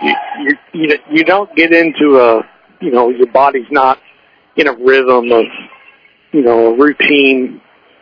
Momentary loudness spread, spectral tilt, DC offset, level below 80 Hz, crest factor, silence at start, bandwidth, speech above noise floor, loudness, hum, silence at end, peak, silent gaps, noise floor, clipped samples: 10 LU; -6.5 dB/octave; under 0.1%; -56 dBFS; 12 dB; 0 s; 5.4 kHz; 37 dB; -10 LUFS; none; 0.45 s; 0 dBFS; none; -47 dBFS; 0.5%